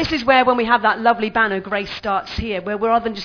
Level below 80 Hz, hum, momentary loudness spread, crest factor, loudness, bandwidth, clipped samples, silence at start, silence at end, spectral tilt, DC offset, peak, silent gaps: -42 dBFS; none; 9 LU; 18 dB; -18 LUFS; 5.4 kHz; under 0.1%; 0 s; 0 s; -5.5 dB/octave; under 0.1%; 0 dBFS; none